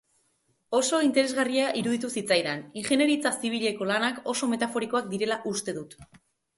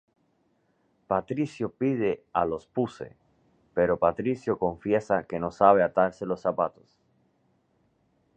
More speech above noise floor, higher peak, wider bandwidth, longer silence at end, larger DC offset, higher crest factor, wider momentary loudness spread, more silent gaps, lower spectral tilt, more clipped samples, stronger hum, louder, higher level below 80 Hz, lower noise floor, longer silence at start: about the same, 44 dB vs 44 dB; about the same, -8 dBFS vs -6 dBFS; first, 12 kHz vs 9 kHz; second, 0.55 s vs 1.65 s; neither; about the same, 18 dB vs 22 dB; about the same, 8 LU vs 10 LU; neither; second, -3 dB/octave vs -8 dB/octave; neither; neither; about the same, -27 LUFS vs -27 LUFS; second, -70 dBFS vs -58 dBFS; about the same, -71 dBFS vs -70 dBFS; second, 0.7 s vs 1.1 s